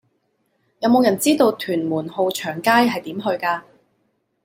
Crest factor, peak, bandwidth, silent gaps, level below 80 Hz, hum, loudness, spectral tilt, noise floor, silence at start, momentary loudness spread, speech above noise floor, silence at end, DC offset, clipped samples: 18 dB; -2 dBFS; 16.5 kHz; none; -66 dBFS; none; -19 LUFS; -4.5 dB/octave; -68 dBFS; 0.8 s; 8 LU; 50 dB; 0.85 s; under 0.1%; under 0.1%